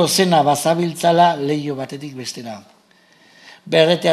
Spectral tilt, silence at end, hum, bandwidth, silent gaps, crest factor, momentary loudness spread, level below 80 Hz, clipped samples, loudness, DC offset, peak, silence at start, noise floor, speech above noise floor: -4.5 dB/octave; 0 s; none; 14.5 kHz; none; 18 dB; 15 LU; -66 dBFS; under 0.1%; -17 LUFS; under 0.1%; 0 dBFS; 0 s; -53 dBFS; 37 dB